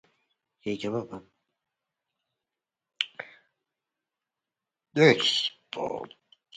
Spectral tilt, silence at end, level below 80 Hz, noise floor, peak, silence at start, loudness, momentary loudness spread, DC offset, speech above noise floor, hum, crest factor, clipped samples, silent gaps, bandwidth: -4.5 dB/octave; 0 s; -72 dBFS; -89 dBFS; -6 dBFS; 0.65 s; -26 LUFS; 24 LU; under 0.1%; 64 dB; none; 26 dB; under 0.1%; none; 9.4 kHz